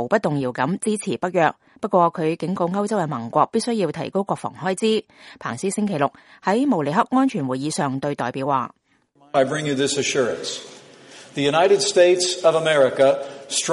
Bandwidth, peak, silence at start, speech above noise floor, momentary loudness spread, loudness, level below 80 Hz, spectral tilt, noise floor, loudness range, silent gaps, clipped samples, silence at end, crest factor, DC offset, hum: 11.5 kHz; -4 dBFS; 0 s; 37 dB; 10 LU; -21 LUFS; -66 dBFS; -4.5 dB/octave; -58 dBFS; 5 LU; none; under 0.1%; 0 s; 18 dB; under 0.1%; none